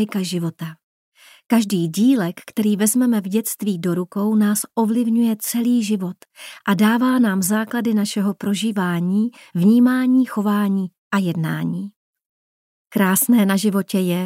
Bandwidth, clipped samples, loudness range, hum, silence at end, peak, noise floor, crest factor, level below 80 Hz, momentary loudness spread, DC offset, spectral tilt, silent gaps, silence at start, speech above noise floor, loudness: 16 kHz; under 0.1%; 2 LU; none; 0 s; -4 dBFS; under -90 dBFS; 16 dB; -72 dBFS; 9 LU; under 0.1%; -5.5 dB/octave; 0.83-1.12 s, 10.98-11.11 s, 11.96-12.14 s, 12.26-12.85 s; 0 s; over 72 dB; -19 LUFS